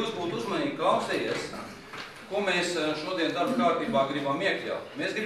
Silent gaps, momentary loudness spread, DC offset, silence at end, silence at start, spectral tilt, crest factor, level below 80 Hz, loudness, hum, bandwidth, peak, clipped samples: none; 12 LU; under 0.1%; 0 s; 0 s; -4.5 dB/octave; 18 dB; -66 dBFS; -28 LUFS; none; 15 kHz; -12 dBFS; under 0.1%